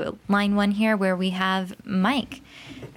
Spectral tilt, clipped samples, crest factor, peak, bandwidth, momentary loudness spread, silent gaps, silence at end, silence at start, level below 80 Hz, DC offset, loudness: -6 dB/octave; under 0.1%; 16 dB; -8 dBFS; 13 kHz; 17 LU; none; 0.05 s; 0 s; -56 dBFS; under 0.1%; -23 LUFS